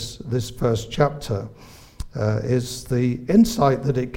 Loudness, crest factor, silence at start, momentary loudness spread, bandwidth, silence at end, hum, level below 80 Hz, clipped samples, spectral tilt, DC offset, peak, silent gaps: -22 LUFS; 18 dB; 0 s; 12 LU; 16.5 kHz; 0 s; none; -40 dBFS; under 0.1%; -6.5 dB/octave; under 0.1%; -4 dBFS; none